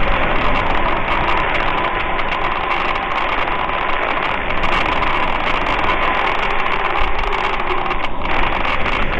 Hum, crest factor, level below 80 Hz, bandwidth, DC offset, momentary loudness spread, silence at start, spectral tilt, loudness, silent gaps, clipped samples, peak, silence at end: none; 14 dB; -24 dBFS; 6.8 kHz; under 0.1%; 3 LU; 0 s; -5.5 dB/octave; -18 LUFS; none; under 0.1%; -2 dBFS; 0 s